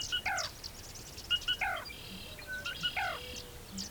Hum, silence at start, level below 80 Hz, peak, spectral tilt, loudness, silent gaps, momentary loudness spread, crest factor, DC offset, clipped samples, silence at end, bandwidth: none; 0 s; -54 dBFS; -20 dBFS; -1 dB/octave; -36 LUFS; none; 12 LU; 18 dB; under 0.1%; under 0.1%; 0 s; over 20 kHz